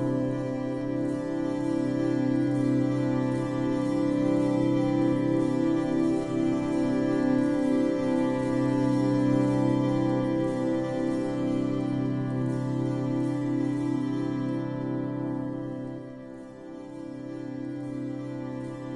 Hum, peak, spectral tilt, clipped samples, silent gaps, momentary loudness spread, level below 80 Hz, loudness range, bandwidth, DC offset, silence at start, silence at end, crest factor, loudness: none; -14 dBFS; -8 dB/octave; under 0.1%; none; 11 LU; -56 dBFS; 8 LU; 11 kHz; under 0.1%; 0 s; 0 s; 14 dB; -27 LUFS